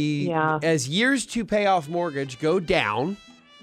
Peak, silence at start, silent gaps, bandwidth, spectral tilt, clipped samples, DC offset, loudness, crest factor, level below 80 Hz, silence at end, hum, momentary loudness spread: -6 dBFS; 0 s; none; 15.5 kHz; -4.5 dB/octave; under 0.1%; under 0.1%; -23 LUFS; 18 dB; -54 dBFS; 0.3 s; none; 7 LU